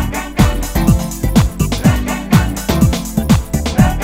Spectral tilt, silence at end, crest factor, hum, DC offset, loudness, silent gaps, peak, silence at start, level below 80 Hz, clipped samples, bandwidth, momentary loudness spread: -6 dB/octave; 0 s; 14 dB; none; under 0.1%; -15 LUFS; none; 0 dBFS; 0 s; -20 dBFS; 0.2%; 16.5 kHz; 3 LU